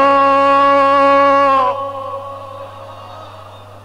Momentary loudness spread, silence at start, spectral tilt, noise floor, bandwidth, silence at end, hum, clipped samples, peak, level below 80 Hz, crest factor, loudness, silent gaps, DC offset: 23 LU; 0 s; -5.5 dB/octave; -36 dBFS; 10.5 kHz; 0.1 s; 50 Hz at -40 dBFS; under 0.1%; -4 dBFS; -58 dBFS; 8 dB; -11 LUFS; none; 0.4%